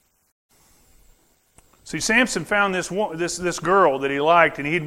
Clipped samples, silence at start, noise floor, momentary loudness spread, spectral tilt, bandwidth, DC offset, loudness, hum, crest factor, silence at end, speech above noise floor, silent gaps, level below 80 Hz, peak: under 0.1%; 1.85 s; -58 dBFS; 8 LU; -3.5 dB/octave; 16 kHz; under 0.1%; -20 LUFS; none; 22 dB; 0 s; 38 dB; none; -52 dBFS; 0 dBFS